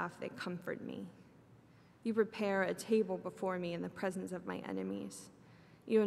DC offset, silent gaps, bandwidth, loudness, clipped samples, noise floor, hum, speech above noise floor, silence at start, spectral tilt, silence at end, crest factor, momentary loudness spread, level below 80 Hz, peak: under 0.1%; none; 14 kHz; -39 LUFS; under 0.1%; -63 dBFS; none; 24 dB; 0 s; -6 dB/octave; 0 s; 20 dB; 14 LU; -80 dBFS; -20 dBFS